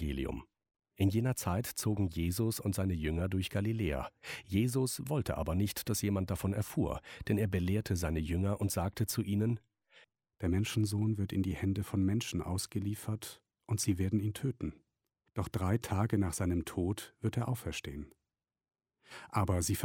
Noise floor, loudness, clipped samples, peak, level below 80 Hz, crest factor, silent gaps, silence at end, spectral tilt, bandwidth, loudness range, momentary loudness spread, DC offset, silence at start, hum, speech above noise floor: under -90 dBFS; -35 LUFS; under 0.1%; -16 dBFS; -50 dBFS; 18 dB; none; 0 s; -6 dB/octave; 17 kHz; 2 LU; 9 LU; under 0.1%; 0 s; none; over 56 dB